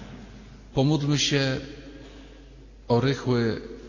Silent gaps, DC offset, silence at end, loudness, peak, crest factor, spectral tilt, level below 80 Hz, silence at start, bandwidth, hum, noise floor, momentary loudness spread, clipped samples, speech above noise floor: none; under 0.1%; 0 s; -25 LUFS; -10 dBFS; 16 dB; -5 dB/octave; -48 dBFS; 0 s; 7.4 kHz; none; -47 dBFS; 22 LU; under 0.1%; 23 dB